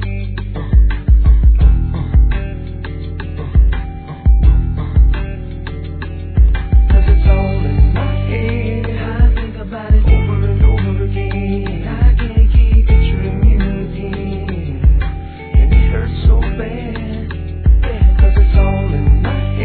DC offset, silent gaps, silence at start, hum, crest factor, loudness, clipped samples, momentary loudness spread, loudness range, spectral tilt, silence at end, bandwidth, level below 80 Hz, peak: 0.3%; none; 0 s; none; 12 dB; -15 LUFS; under 0.1%; 13 LU; 2 LU; -11.5 dB/octave; 0 s; 4.4 kHz; -12 dBFS; 0 dBFS